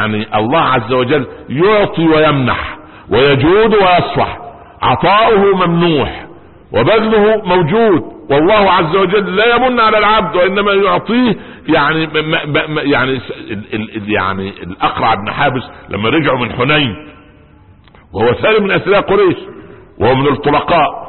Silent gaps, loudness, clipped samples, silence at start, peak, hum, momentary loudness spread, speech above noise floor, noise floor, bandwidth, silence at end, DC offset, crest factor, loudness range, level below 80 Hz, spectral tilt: none; -12 LUFS; under 0.1%; 0 s; 0 dBFS; none; 12 LU; 31 dB; -42 dBFS; 4.3 kHz; 0 s; under 0.1%; 12 dB; 5 LU; -38 dBFS; -11.5 dB/octave